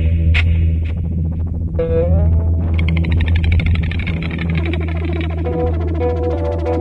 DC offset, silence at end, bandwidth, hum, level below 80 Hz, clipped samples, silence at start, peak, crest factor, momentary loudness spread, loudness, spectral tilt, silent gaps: under 0.1%; 0 s; 4.6 kHz; none; -24 dBFS; under 0.1%; 0 s; -2 dBFS; 12 dB; 6 LU; -17 LUFS; -9 dB/octave; none